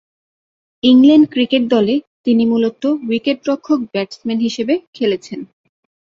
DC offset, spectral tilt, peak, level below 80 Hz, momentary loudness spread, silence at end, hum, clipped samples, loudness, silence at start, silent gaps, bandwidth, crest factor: under 0.1%; -6 dB/octave; -2 dBFS; -60 dBFS; 12 LU; 0.65 s; none; under 0.1%; -15 LUFS; 0.85 s; 2.07-2.24 s, 4.87-4.93 s; 7.6 kHz; 14 dB